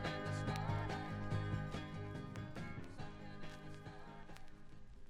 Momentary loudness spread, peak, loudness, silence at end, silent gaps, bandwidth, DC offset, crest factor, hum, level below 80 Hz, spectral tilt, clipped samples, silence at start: 16 LU; -24 dBFS; -46 LUFS; 0 s; none; 13 kHz; under 0.1%; 22 dB; none; -56 dBFS; -6.5 dB/octave; under 0.1%; 0 s